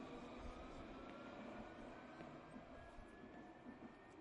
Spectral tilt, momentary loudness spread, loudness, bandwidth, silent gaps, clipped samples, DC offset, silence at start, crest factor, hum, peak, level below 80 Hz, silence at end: -6 dB/octave; 5 LU; -57 LUFS; 10.5 kHz; none; under 0.1%; under 0.1%; 0 s; 16 dB; none; -40 dBFS; -66 dBFS; 0 s